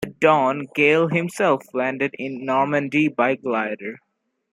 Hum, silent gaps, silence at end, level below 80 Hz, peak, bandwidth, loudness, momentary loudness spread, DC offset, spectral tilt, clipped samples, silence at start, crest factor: none; none; 0.6 s; -64 dBFS; -2 dBFS; 14 kHz; -20 LUFS; 9 LU; under 0.1%; -6 dB/octave; under 0.1%; 0 s; 20 dB